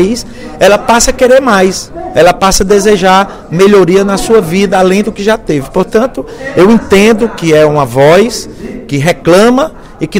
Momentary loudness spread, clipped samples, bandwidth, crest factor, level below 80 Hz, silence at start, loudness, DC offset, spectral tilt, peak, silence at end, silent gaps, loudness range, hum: 10 LU; 3%; 16.5 kHz; 8 dB; -28 dBFS; 0 s; -8 LUFS; under 0.1%; -4.5 dB/octave; 0 dBFS; 0 s; none; 2 LU; none